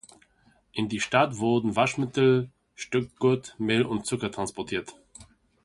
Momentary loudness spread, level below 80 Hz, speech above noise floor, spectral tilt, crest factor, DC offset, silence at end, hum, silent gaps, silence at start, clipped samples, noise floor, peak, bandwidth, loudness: 10 LU; -60 dBFS; 38 dB; -5.5 dB/octave; 22 dB; under 0.1%; 0.4 s; none; none; 0.75 s; under 0.1%; -64 dBFS; -6 dBFS; 11.5 kHz; -26 LUFS